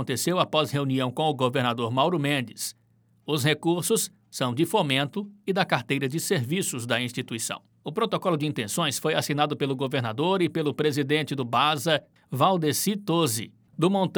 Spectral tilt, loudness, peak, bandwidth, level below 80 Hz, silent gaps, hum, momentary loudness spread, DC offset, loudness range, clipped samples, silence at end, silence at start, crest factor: -4.5 dB/octave; -26 LUFS; -6 dBFS; over 20 kHz; -76 dBFS; none; none; 7 LU; under 0.1%; 2 LU; under 0.1%; 0 s; 0 s; 20 dB